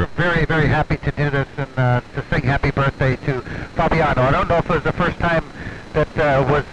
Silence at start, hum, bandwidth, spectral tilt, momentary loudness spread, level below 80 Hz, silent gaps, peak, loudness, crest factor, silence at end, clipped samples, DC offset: 0 s; none; 8.8 kHz; -7.5 dB/octave; 8 LU; -32 dBFS; none; -4 dBFS; -19 LUFS; 14 dB; 0 s; under 0.1%; 0.6%